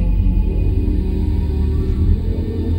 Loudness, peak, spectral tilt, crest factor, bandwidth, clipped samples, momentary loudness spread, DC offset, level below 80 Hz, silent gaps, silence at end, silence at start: -19 LUFS; -4 dBFS; -10 dB/octave; 12 dB; 5 kHz; under 0.1%; 2 LU; 0.4%; -18 dBFS; none; 0 s; 0 s